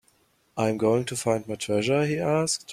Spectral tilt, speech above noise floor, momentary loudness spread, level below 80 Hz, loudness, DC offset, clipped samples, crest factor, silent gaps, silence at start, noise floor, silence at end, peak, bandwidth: -4.5 dB/octave; 40 dB; 5 LU; -62 dBFS; -25 LUFS; under 0.1%; under 0.1%; 18 dB; none; 0.55 s; -65 dBFS; 0 s; -8 dBFS; 15.5 kHz